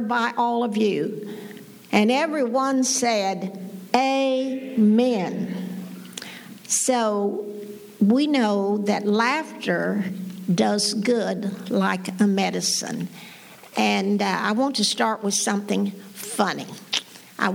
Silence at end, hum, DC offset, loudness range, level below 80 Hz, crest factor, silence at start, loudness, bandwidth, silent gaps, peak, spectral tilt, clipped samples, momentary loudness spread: 0 s; none; under 0.1%; 2 LU; -76 dBFS; 20 dB; 0 s; -23 LUFS; 20 kHz; none; -2 dBFS; -4 dB/octave; under 0.1%; 15 LU